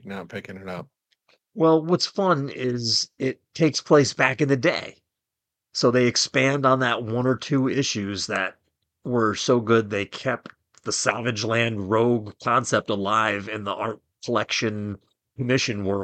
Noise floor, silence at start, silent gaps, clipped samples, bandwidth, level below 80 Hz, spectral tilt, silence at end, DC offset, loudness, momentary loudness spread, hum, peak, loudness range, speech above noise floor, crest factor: -85 dBFS; 0.05 s; none; under 0.1%; 9.2 kHz; -64 dBFS; -4.5 dB/octave; 0 s; under 0.1%; -23 LUFS; 14 LU; none; -2 dBFS; 3 LU; 63 dB; 22 dB